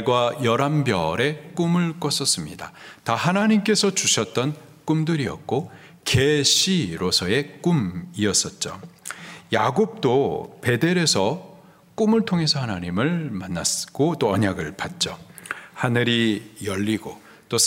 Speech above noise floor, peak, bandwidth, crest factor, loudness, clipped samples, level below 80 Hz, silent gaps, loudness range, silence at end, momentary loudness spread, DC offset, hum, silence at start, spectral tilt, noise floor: 20 dB; -4 dBFS; 16 kHz; 20 dB; -22 LUFS; under 0.1%; -56 dBFS; none; 3 LU; 0 s; 14 LU; under 0.1%; none; 0 s; -4 dB/octave; -42 dBFS